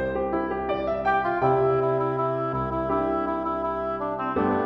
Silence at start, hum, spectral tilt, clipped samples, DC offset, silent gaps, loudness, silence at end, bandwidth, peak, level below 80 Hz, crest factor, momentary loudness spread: 0 s; none; -9 dB/octave; under 0.1%; under 0.1%; none; -25 LUFS; 0 s; 5.8 kHz; -10 dBFS; -46 dBFS; 14 dB; 5 LU